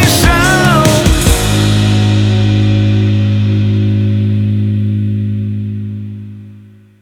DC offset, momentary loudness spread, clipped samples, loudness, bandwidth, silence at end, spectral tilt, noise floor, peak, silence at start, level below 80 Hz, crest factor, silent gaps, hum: under 0.1%; 12 LU; under 0.1%; -11 LUFS; 18 kHz; 0.4 s; -5.5 dB/octave; -38 dBFS; 0 dBFS; 0 s; -22 dBFS; 10 dB; none; 50 Hz at -50 dBFS